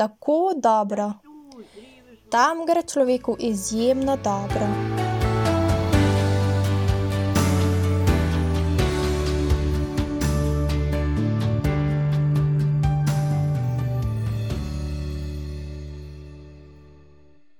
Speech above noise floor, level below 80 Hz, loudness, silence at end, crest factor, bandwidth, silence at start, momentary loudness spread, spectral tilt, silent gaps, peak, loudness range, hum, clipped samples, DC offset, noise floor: 33 dB; -32 dBFS; -23 LUFS; 0.8 s; 16 dB; 18 kHz; 0 s; 10 LU; -6.5 dB/octave; none; -6 dBFS; 5 LU; none; under 0.1%; under 0.1%; -55 dBFS